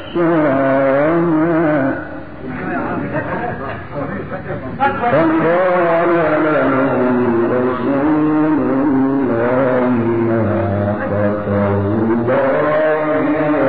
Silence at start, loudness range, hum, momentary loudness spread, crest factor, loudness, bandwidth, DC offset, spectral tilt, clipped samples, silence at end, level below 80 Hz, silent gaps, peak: 0 s; 5 LU; none; 10 LU; 12 dB; -16 LUFS; 4.8 kHz; 2%; -7 dB/octave; under 0.1%; 0 s; -46 dBFS; none; -2 dBFS